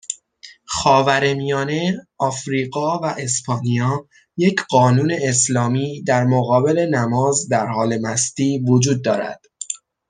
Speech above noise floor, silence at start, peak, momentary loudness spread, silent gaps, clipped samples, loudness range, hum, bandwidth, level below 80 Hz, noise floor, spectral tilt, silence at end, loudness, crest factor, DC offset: 28 dB; 0.1 s; -2 dBFS; 10 LU; none; under 0.1%; 3 LU; none; 10 kHz; -56 dBFS; -45 dBFS; -5 dB/octave; 0.35 s; -18 LUFS; 18 dB; under 0.1%